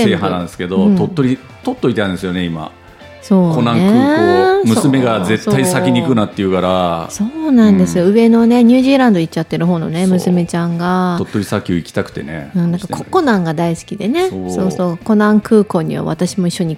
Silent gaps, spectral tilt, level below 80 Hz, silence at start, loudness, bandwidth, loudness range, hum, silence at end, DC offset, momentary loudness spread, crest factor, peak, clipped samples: none; -6.5 dB/octave; -48 dBFS; 0 s; -14 LUFS; 16 kHz; 6 LU; none; 0 s; under 0.1%; 9 LU; 12 dB; 0 dBFS; under 0.1%